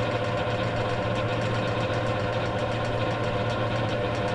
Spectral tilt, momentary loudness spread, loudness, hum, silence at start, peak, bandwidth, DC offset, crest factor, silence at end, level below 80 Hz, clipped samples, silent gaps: -6.5 dB/octave; 1 LU; -27 LUFS; none; 0 s; -14 dBFS; 11 kHz; under 0.1%; 12 dB; 0 s; -44 dBFS; under 0.1%; none